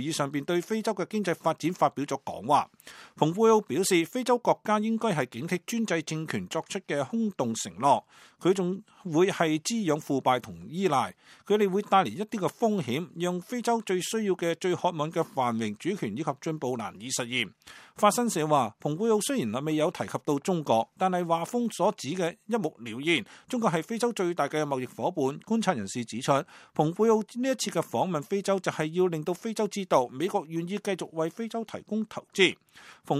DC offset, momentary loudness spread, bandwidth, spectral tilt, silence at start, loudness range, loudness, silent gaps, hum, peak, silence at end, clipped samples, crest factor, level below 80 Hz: under 0.1%; 8 LU; 15.5 kHz; -5 dB/octave; 0 s; 3 LU; -28 LUFS; none; none; -6 dBFS; 0 s; under 0.1%; 22 dB; -74 dBFS